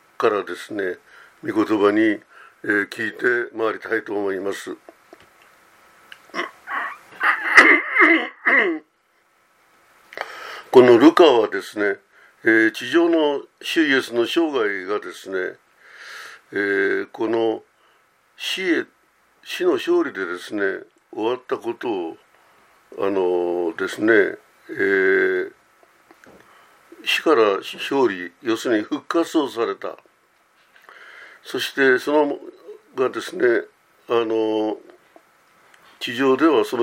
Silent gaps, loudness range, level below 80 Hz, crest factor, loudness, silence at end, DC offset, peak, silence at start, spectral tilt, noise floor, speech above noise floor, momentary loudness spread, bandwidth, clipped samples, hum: none; 9 LU; -72 dBFS; 22 dB; -20 LUFS; 0 s; under 0.1%; 0 dBFS; 0.2 s; -4 dB/octave; -63 dBFS; 43 dB; 18 LU; 16 kHz; under 0.1%; none